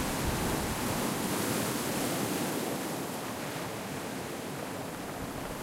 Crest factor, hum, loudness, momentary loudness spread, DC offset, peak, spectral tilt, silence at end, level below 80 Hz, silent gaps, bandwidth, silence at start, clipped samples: 16 dB; none; -33 LUFS; 7 LU; under 0.1%; -18 dBFS; -4 dB/octave; 0 s; -50 dBFS; none; 16 kHz; 0 s; under 0.1%